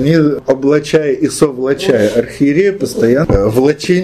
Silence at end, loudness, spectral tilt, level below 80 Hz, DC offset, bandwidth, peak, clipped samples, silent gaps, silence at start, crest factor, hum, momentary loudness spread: 0 s; -12 LUFS; -6 dB/octave; -30 dBFS; under 0.1%; 15 kHz; 0 dBFS; under 0.1%; none; 0 s; 12 dB; none; 3 LU